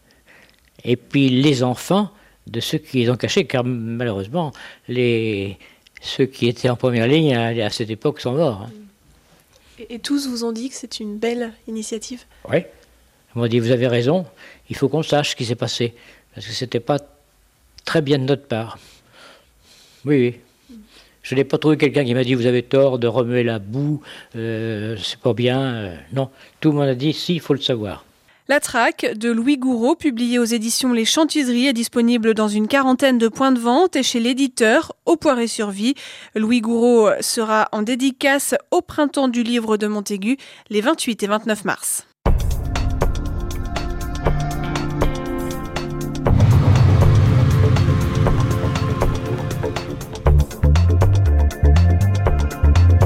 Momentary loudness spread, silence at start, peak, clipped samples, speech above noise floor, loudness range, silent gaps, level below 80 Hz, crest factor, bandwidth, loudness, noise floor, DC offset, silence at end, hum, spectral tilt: 11 LU; 0.85 s; -2 dBFS; under 0.1%; 37 dB; 7 LU; none; -28 dBFS; 16 dB; 16 kHz; -19 LUFS; -56 dBFS; under 0.1%; 0 s; none; -5.5 dB/octave